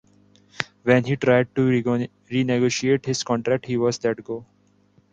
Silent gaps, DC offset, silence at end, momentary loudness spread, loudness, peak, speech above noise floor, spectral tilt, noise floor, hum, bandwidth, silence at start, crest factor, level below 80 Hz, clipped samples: none; under 0.1%; 0.7 s; 11 LU; -22 LUFS; 0 dBFS; 38 dB; -5.5 dB/octave; -60 dBFS; 50 Hz at -50 dBFS; 8.8 kHz; 0.6 s; 22 dB; -58 dBFS; under 0.1%